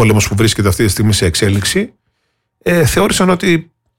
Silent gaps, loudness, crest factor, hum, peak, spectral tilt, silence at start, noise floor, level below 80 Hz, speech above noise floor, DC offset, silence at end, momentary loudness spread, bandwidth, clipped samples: none; -13 LUFS; 10 dB; none; -2 dBFS; -4.5 dB/octave; 0 s; -67 dBFS; -32 dBFS; 55 dB; under 0.1%; 0.35 s; 5 LU; 17 kHz; under 0.1%